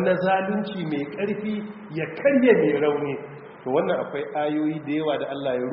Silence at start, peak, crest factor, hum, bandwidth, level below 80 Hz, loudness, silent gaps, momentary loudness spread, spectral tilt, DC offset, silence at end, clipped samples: 0 s; -4 dBFS; 20 dB; none; 5.6 kHz; -66 dBFS; -24 LUFS; none; 12 LU; -5 dB/octave; under 0.1%; 0 s; under 0.1%